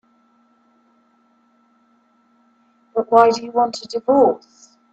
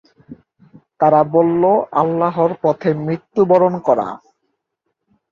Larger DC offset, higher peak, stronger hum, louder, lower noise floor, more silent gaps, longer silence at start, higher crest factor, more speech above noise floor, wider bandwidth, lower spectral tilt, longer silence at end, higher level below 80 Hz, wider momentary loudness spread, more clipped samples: neither; about the same, 0 dBFS vs -2 dBFS; neither; about the same, -17 LUFS vs -16 LUFS; second, -59 dBFS vs -74 dBFS; neither; first, 2.95 s vs 0.3 s; about the same, 20 dB vs 16 dB; second, 43 dB vs 59 dB; first, 8.2 kHz vs 7 kHz; second, -5 dB/octave vs -9.5 dB/octave; second, 0.55 s vs 1.15 s; second, -66 dBFS vs -60 dBFS; first, 12 LU vs 7 LU; neither